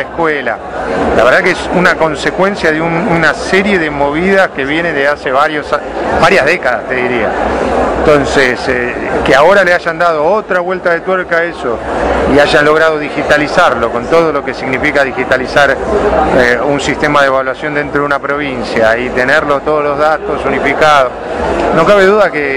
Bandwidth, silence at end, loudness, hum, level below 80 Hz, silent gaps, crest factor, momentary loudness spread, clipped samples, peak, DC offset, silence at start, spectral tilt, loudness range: 14 kHz; 0 s; -10 LUFS; none; -32 dBFS; none; 10 dB; 7 LU; 2%; 0 dBFS; 0.2%; 0 s; -5 dB/octave; 1 LU